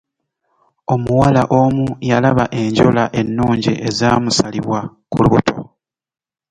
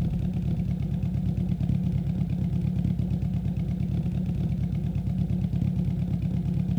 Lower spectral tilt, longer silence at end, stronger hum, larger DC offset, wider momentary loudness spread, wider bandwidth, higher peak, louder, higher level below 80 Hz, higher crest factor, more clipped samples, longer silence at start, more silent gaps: second, -6 dB/octave vs -10 dB/octave; first, 0.9 s vs 0 s; neither; neither; first, 9 LU vs 2 LU; first, 10.5 kHz vs 6.2 kHz; first, 0 dBFS vs -14 dBFS; first, -15 LUFS vs -28 LUFS; second, -42 dBFS vs -36 dBFS; about the same, 16 dB vs 12 dB; neither; first, 0.9 s vs 0 s; neither